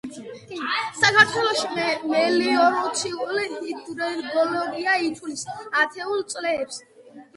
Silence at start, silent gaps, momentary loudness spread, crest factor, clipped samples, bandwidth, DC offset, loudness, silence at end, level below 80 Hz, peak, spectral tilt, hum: 0.05 s; none; 15 LU; 22 dB; under 0.1%; 11.5 kHz; under 0.1%; -22 LUFS; 0.15 s; -66 dBFS; -2 dBFS; -2.5 dB/octave; none